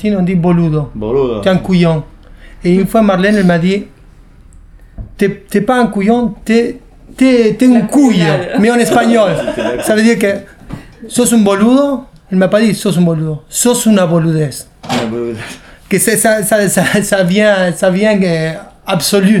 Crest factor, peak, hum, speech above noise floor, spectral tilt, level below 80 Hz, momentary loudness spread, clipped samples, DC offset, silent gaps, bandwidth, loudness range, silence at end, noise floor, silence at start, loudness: 12 dB; 0 dBFS; none; 28 dB; -5.5 dB/octave; -38 dBFS; 10 LU; under 0.1%; under 0.1%; none; 17 kHz; 3 LU; 0 s; -39 dBFS; 0 s; -11 LUFS